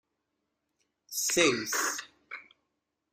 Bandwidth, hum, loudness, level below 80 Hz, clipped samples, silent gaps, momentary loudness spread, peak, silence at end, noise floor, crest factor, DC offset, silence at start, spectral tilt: 16 kHz; none; -28 LUFS; -70 dBFS; under 0.1%; none; 21 LU; -10 dBFS; 0.7 s; -82 dBFS; 24 dB; under 0.1%; 1.1 s; -1.5 dB/octave